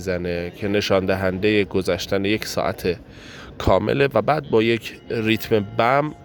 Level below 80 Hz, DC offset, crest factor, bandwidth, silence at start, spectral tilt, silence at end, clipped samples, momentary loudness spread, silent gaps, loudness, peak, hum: -44 dBFS; under 0.1%; 18 dB; 19 kHz; 0 s; -5.5 dB/octave; 0 s; under 0.1%; 8 LU; none; -21 LUFS; -4 dBFS; none